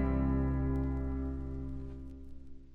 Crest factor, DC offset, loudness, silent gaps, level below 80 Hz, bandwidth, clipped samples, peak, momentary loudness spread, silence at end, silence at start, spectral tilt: 14 dB; under 0.1%; -35 LUFS; none; -38 dBFS; 3 kHz; under 0.1%; -20 dBFS; 20 LU; 0 s; 0 s; -11 dB/octave